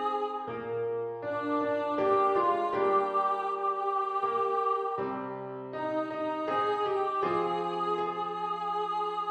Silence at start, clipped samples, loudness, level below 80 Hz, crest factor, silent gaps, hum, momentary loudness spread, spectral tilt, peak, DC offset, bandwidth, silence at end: 0 s; under 0.1%; -30 LUFS; -74 dBFS; 16 dB; none; none; 8 LU; -6.5 dB/octave; -14 dBFS; under 0.1%; 8.4 kHz; 0 s